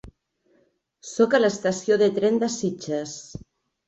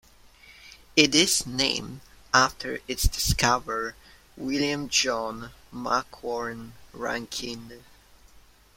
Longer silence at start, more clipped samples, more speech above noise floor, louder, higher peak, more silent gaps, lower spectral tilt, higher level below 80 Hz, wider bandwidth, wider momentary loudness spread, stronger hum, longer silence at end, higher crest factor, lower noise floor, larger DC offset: second, 0.05 s vs 0.45 s; neither; first, 43 dB vs 28 dB; about the same, -23 LUFS vs -25 LUFS; second, -6 dBFS vs -2 dBFS; neither; first, -4.5 dB/octave vs -2.5 dB/octave; second, -58 dBFS vs -40 dBFS; second, 8.2 kHz vs 16.5 kHz; first, 20 LU vs 17 LU; neither; about the same, 0.5 s vs 0.4 s; second, 18 dB vs 26 dB; first, -65 dBFS vs -55 dBFS; neither